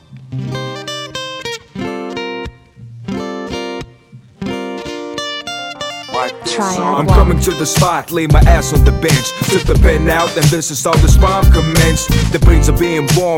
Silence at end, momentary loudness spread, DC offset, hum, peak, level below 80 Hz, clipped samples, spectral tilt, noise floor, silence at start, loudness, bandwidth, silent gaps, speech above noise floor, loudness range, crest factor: 0 s; 13 LU; under 0.1%; none; 0 dBFS; -16 dBFS; under 0.1%; -5 dB/octave; -40 dBFS; 0.1 s; -14 LUFS; 17 kHz; none; 30 dB; 12 LU; 14 dB